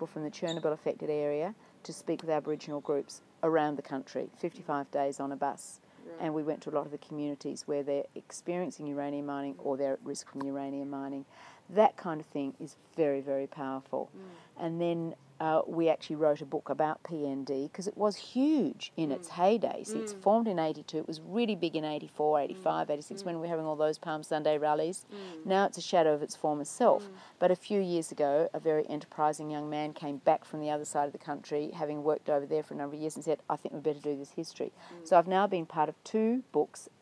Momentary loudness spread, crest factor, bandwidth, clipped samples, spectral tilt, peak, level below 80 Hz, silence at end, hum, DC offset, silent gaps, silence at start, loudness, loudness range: 11 LU; 22 dB; 11 kHz; under 0.1%; -5.5 dB/octave; -12 dBFS; -90 dBFS; 0.15 s; none; under 0.1%; none; 0 s; -33 LUFS; 6 LU